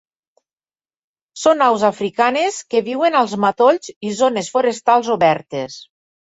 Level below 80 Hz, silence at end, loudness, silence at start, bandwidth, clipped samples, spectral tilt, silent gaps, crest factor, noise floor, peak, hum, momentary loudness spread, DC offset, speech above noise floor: -62 dBFS; 0.4 s; -17 LUFS; 1.35 s; 8.2 kHz; under 0.1%; -4 dB/octave; 3.96-4.01 s; 16 dB; under -90 dBFS; -2 dBFS; none; 10 LU; under 0.1%; over 74 dB